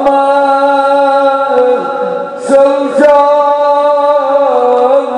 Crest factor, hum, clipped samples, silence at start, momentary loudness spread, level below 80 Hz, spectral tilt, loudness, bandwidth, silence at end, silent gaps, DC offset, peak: 8 dB; none; 0.7%; 0 s; 5 LU; -54 dBFS; -4.5 dB/octave; -9 LUFS; 10.5 kHz; 0 s; none; under 0.1%; 0 dBFS